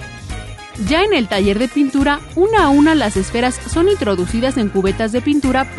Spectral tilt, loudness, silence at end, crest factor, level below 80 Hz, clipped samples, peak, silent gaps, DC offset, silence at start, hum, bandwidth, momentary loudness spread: -5 dB/octave; -15 LUFS; 0 s; 12 dB; -32 dBFS; under 0.1%; -2 dBFS; none; under 0.1%; 0 s; none; 11.5 kHz; 11 LU